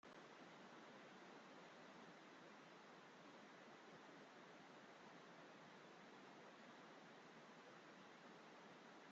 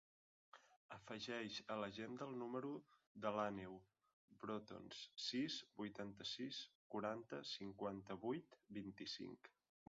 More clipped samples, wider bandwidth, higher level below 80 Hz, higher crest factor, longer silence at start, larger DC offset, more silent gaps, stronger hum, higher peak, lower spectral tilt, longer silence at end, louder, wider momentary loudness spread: neither; about the same, 7.6 kHz vs 7.4 kHz; second, under -90 dBFS vs -82 dBFS; second, 14 dB vs 22 dB; second, 0.05 s vs 0.55 s; neither; second, none vs 0.76-0.89 s, 3.07-3.15 s, 4.13-4.28 s, 6.75-6.90 s; neither; second, -50 dBFS vs -28 dBFS; about the same, -2.5 dB/octave vs -3 dB/octave; second, 0 s vs 0.4 s; second, -63 LUFS vs -50 LUFS; second, 1 LU vs 15 LU